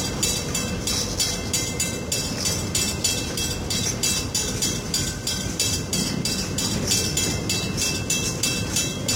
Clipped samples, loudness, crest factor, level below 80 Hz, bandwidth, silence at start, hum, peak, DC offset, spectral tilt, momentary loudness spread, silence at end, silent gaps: under 0.1%; -23 LUFS; 18 dB; -40 dBFS; 17 kHz; 0 s; none; -6 dBFS; under 0.1%; -2.5 dB/octave; 3 LU; 0 s; none